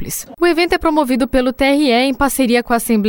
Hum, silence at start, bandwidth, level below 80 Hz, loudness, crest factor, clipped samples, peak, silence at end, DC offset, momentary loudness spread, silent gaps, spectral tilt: none; 0 s; over 20 kHz; -34 dBFS; -15 LUFS; 14 dB; under 0.1%; 0 dBFS; 0 s; under 0.1%; 3 LU; none; -4 dB/octave